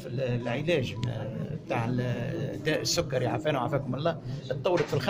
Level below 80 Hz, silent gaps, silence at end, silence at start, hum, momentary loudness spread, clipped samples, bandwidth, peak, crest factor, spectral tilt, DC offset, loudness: -54 dBFS; none; 0 s; 0 s; none; 7 LU; under 0.1%; 16 kHz; -14 dBFS; 16 dB; -5.5 dB/octave; under 0.1%; -30 LUFS